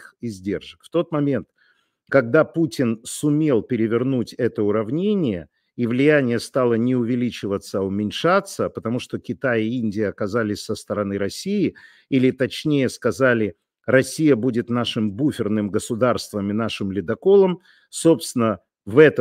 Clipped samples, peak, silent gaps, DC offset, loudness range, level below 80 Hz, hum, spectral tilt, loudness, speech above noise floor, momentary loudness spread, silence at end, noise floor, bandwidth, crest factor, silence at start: under 0.1%; 0 dBFS; none; under 0.1%; 3 LU; -60 dBFS; none; -6 dB/octave; -21 LUFS; 42 dB; 10 LU; 0 s; -63 dBFS; 16 kHz; 20 dB; 0 s